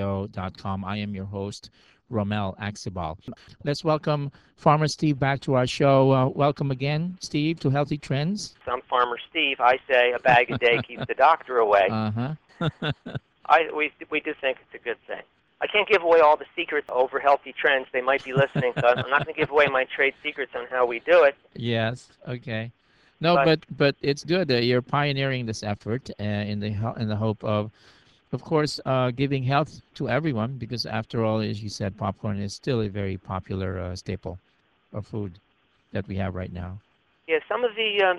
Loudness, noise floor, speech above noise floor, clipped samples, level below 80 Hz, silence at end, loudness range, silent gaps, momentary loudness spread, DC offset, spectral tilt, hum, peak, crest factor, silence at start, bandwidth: -24 LUFS; -65 dBFS; 41 dB; under 0.1%; -56 dBFS; 0 s; 9 LU; none; 14 LU; under 0.1%; -6 dB/octave; none; -2 dBFS; 22 dB; 0 s; 11.5 kHz